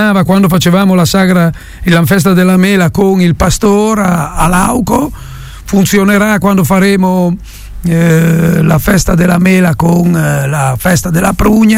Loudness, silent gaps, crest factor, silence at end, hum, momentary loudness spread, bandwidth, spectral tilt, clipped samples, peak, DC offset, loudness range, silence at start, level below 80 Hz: -9 LUFS; none; 8 dB; 0 s; none; 6 LU; 16.5 kHz; -6 dB/octave; under 0.1%; 0 dBFS; under 0.1%; 2 LU; 0 s; -26 dBFS